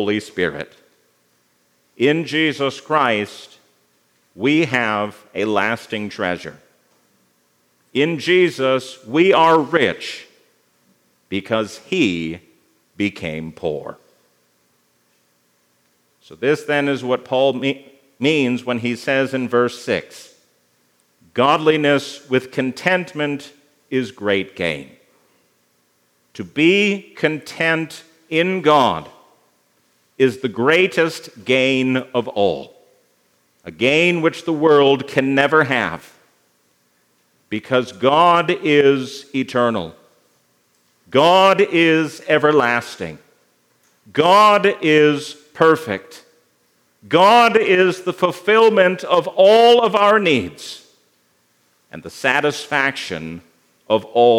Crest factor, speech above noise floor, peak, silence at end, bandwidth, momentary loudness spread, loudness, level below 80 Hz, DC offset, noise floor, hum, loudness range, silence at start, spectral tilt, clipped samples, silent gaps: 18 dB; 45 dB; 0 dBFS; 0 s; 15.5 kHz; 15 LU; -17 LUFS; -66 dBFS; under 0.1%; -62 dBFS; 60 Hz at -55 dBFS; 8 LU; 0 s; -5 dB/octave; under 0.1%; none